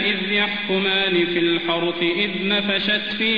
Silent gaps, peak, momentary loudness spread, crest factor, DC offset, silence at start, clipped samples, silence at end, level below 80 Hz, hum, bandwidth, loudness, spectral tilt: none; -8 dBFS; 3 LU; 14 dB; 0.5%; 0 s; under 0.1%; 0 s; -56 dBFS; none; 5.2 kHz; -19 LUFS; -6.5 dB/octave